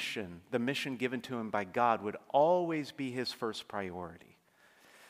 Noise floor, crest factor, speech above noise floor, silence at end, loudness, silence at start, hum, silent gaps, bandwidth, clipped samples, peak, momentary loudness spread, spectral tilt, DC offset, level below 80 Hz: -65 dBFS; 20 dB; 32 dB; 0.05 s; -34 LUFS; 0 s; none; none; 15.5 kHz; under 0.1%; -14 dBFS; 11 LU; -5 dB/octave; under 0.1%; -78 dBFS